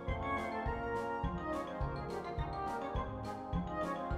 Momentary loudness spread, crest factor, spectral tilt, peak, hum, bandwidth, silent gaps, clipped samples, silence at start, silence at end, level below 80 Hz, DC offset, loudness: 3 LU; 16 dB; -7 dB/octave; -24 dBFS; none; 14 kHz; none; under 0.1%; 0 s; 0 s; -46 dBFS; under 0.1%; -39 LUFS